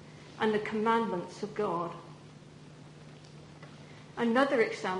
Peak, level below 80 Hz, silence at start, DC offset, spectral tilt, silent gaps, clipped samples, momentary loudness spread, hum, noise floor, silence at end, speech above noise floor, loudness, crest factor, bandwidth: -12 dBFS; -70 dBFS; 0 s; under 0.1%; -5.5 dB/octave; none; under 0.1%; 24 LU; none; -51 dBFS; 0 s; 21 dB; -31 LUFS; 22 dB; 10.5 kHz